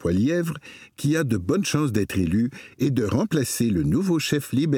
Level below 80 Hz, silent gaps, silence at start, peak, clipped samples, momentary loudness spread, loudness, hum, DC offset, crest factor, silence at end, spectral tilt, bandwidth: -48 dBFS; none; 0 s; -8 dBFS; under 0.1%; 6 LU; -23 LUFS; none; under 0.1%; 16 dB; 0 s; -6 dB/octave; 18.5 kHz